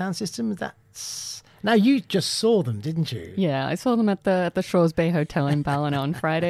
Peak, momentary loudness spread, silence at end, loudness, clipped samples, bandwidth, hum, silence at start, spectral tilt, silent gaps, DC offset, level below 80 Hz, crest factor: -8 dBFS; 11 LU; 0 s; -23 LUFS; under 0.1%; 15 kHz; none; 0 s; -5.5 dB/octave; none; under 0.1%; -56 dBFS; 16 dB